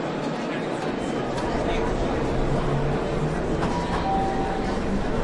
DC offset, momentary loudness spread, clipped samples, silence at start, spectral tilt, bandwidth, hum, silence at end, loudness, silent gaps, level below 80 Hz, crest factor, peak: under 0.1%; 3 LU; under 0.1%; 0 s; -6.5 dB/octave; 11.5 kHz; none; 0 s; -26 LUFS; none; -32 dBFS; 12 dB; -12 dBFS